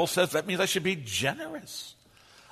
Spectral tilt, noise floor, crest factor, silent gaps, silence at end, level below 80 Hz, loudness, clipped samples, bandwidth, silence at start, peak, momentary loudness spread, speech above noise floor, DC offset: -3 dB/octave; -57 dBFS; 18 dB; none; 0.6 s; -66 dBFS; -28 LUFS; under 0.1%; 13.5 kHz; 0 s; -12 dBFS; 14 LU; 27 dB; under 0.1%